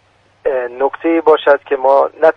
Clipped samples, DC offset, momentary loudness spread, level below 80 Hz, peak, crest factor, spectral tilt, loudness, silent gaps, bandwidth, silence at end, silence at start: under 0.1%; under 0.1%; 8 LU; -56 dBFS; 0 dBFS; 14 dB; -6 dB/octave; -14 LUFS; none; 5.8 kHz; 0.05 s; 0.45 s